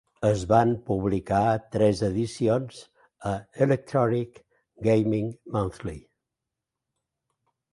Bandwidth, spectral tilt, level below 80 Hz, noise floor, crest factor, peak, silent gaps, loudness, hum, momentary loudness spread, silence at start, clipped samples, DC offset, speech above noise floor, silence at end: 11.5 kHz; -7.5 dB/octave; -50 dBFS; -86 dBFS; 20 dB; -6 dBFS; none; -25 LUFS; none; 12 LU; 0.2 s; under 0.1%; under 0.1%; 62 dB; 1.75 s